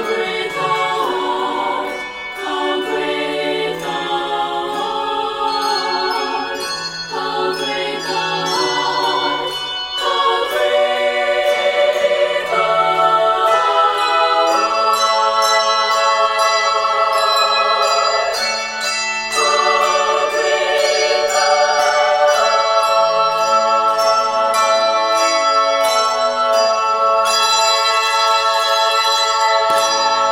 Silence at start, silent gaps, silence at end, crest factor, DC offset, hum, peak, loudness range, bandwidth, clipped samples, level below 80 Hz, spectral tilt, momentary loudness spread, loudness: 0 s; none; 0 s; 14 dB; under 0.1%; none; -2 dBFS; 6 LU; 16.5 kHz; under 0.1%; -56 dBFS; -1 dB/octave; 7 LU; -15 LUFS